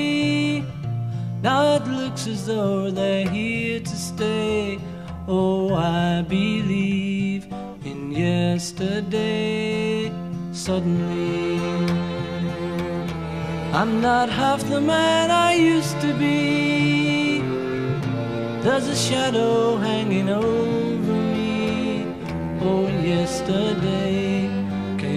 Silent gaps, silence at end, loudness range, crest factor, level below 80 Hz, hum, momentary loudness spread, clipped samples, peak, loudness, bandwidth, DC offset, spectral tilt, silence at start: none; 0 s; 5 LU; 16 dB; -48 dBFS; none; 9 LU; under 0.1%; -6 dBFS; -22 LUFS; 14 kHz; 0.2%; -5.5 dB/octave; 0 s